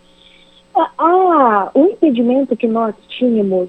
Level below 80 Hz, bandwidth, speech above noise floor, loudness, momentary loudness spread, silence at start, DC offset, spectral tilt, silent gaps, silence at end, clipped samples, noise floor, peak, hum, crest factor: -60 dBFS; 8.4 kHz; 32 dB; -14 LUFS; 8 LU; 0.75 s; under 0.1%; -8.5 dB/octave; none; 0 s; under 0.1%; -47 dBFS; 0 dBFS; none; 14 dB